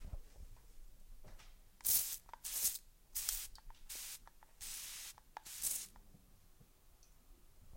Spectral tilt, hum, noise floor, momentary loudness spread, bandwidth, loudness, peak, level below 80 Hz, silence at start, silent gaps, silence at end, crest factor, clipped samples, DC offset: 0.5 dB/octave; none; -65 dBFS; 27 LU; 16.5 kHz; -40 LUFS; -14 dBFS; -58 dBFS; 0 s; none; 0 s; 32 dB; under 0.1%; under 0.1%